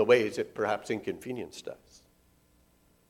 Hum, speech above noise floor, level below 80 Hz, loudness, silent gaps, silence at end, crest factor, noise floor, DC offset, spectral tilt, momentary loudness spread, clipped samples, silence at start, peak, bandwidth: none; 35 dB; -68 dBFS; -31 LUFS; none; 1.35 s; 22 dB; -65 dBFS; under 0.1%; -5 dB/octave; 19 LU; under 0.1%; 0 s; -10 dBFS; 14.5 kHz